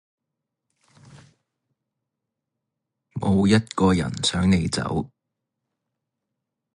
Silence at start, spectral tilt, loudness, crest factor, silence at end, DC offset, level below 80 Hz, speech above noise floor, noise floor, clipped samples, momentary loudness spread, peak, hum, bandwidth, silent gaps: 3.15 s; -5.5 dB/octave; -22 LUFS; 20 dB; 1.7 s; under 0.1%; -44 dBFS; 62 dB; -83 dBFS; under 0.1%; 10 LU; -6 dBFS; none; 11 kHz; none